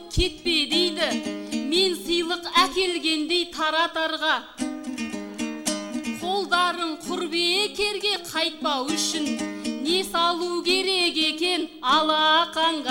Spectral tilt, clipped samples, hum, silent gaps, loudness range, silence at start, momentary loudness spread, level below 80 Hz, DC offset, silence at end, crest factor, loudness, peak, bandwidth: -2.5 dB/octave; under 0.1%; none; none; 4 LU; 0 s; 10 LU; -44 dBFS; under 0.1%; 0 s; 18 dB; -23 LUFS; -6 dBFS; 16 kHz